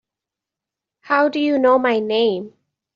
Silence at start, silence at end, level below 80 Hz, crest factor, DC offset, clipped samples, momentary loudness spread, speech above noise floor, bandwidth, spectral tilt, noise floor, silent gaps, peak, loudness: 1.05 s; 0.5 s; -68 dBFS; 18 dB; under 0.1%; under 0.1%; 9 LU; 69 dB; 7.2 kHz; -2 dB/octave; -86 dBFS; none; -2 dBFS; -18 LUFS